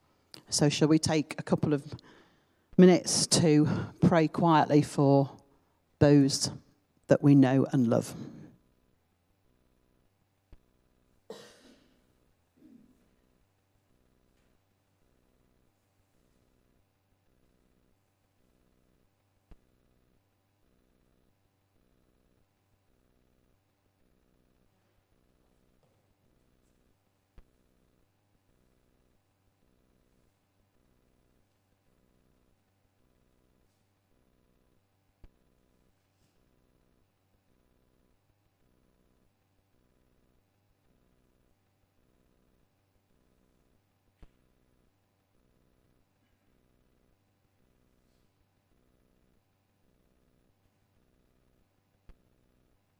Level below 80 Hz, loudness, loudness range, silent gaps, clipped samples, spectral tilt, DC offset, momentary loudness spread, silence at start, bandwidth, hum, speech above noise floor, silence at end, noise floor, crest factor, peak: -66 dBFS; -25 LUFS; 5 LU; none; under 0.1%; -5.5 dB/octave; under 0.1%; 11 LU; 0.5 s; 13 kHz; none; 48 dB; 41.65 s; -73 dBFS; 26 dB; -8 dBFS